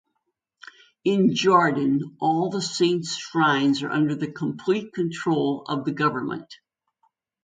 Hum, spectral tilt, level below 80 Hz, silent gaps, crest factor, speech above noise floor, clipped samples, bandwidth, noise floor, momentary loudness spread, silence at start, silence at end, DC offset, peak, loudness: none; -5.5 dB/octave; -70 dBFS; none; 20 dB; 55 dB; under 0.1%; 9.4 kHz; -78 dBFS; 10 LU; 1.05 s; 0.9 s; under 0.1%; -4 dBFS; -23 LUFS